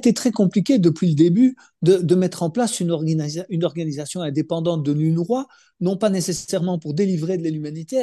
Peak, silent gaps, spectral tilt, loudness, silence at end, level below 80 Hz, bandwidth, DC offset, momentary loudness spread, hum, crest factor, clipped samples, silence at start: -4 dBFS; none; -6.5 dB/octave; -20 LUFS; 0 s; -64 dBFS; 12.5 kHz; under 0.1%; 9 LU; none; 16 dB; under 0.1%; 0 s